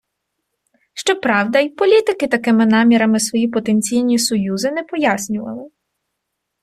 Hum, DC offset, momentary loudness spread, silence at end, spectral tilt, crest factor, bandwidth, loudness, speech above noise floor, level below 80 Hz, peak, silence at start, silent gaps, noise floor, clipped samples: none; under 0.1%; 10 LU; 0.95 s; -4 dB/octave; 14 dB; 13.5 kHz; -16 LUFS; 61 dB; -60 dBFS; -2 dBFS; 0.95 s; none; -76 dBFS; under 0.1%